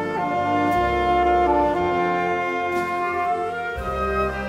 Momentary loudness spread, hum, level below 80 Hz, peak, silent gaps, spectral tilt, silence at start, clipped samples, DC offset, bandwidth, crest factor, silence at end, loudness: 7 LU; none; -38 dBFS; -8 dBFS; none; -6.5 dB/octave; 0 s; under 0.1%; under 0.1%; 15.5 kHz; 14 dB; 0 s; -22 LUFS